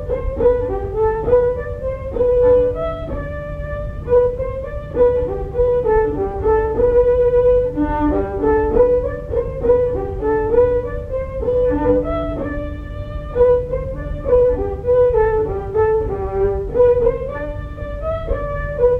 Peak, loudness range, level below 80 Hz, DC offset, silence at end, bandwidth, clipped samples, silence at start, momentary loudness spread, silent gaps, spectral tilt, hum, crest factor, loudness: -2 dBFS; 3 LU; -28 dBFS; under 0.1%; 0 s; 3.7 kHz; under 0.1%; 0 s; 12 LU; none; -10 dB/octave; none; 14 dB; -18 LUFS